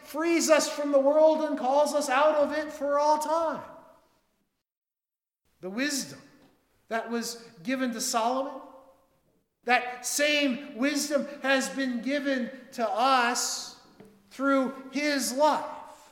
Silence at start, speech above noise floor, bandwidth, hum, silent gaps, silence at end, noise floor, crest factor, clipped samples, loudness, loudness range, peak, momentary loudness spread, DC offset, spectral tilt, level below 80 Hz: 0.05 s; over 64 dB; 18 kHz; none; 4.77-4.81 s; 0.15 s; under -90 dBFS; 22 dB; under 0.1%; -27 LUFS; 10 LU; -6 dBFS; 13 LU; under 0.1%; -2 dB/octave; -74 dBFS